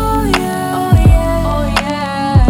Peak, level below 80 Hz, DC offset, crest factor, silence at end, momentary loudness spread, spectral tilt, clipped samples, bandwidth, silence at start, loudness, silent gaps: 0 dBFS; -18 dBFS; under 0.1%; 10 dB; 0 s; 7 LU; -6.5 dB/octave; under 0.1%; 17 kHz; 0 s; -14 LUFS; none